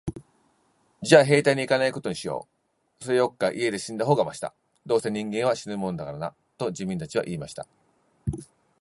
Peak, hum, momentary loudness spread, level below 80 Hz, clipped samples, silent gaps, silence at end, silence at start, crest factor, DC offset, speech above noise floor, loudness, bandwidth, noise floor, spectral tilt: -2 dBFS; none; 17 LU; -54 dBFS; under 0.1%; none; 0.35 s; 0.05 s; 24 dB; under 0.1%; 47 dB; -25 LUFS; 11.5 kHz; -72 dBFS; -5 dB/octave